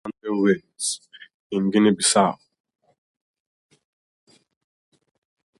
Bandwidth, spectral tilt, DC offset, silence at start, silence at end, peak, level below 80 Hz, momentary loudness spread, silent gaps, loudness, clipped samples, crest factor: 11.5 kHz; -4 dB/octave; under 0.1%; 0.05 s; 3.25 s; -6 dBFS; -68 dBFS; 12 LU; 1.34-1.50 s; -21 LUFS; under 0.1%; 20 dB